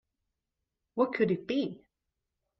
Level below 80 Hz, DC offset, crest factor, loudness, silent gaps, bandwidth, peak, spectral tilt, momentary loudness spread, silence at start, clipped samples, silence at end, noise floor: -74 dBFS; under 0.1%; 20 dB; -31 LUFS; none; 6.2 kHz; -14 dBFS; -5 dB/octave; 10 LU; 0.95 s; under 0.1%; 0.85 s; -86 dBFS